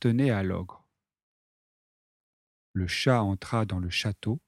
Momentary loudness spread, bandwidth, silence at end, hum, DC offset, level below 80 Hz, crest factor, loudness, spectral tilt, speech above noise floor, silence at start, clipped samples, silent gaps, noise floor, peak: 11 LU; 13 kHz; 0.1 s; none; under 0.1%; -54 dBFS; 20 dB; -28 LUFS; -6 dB/octave; over 63 dB; 0 s; under 0.1%; 1.23-2.74 s; under -90 dBFS; -10 dBFS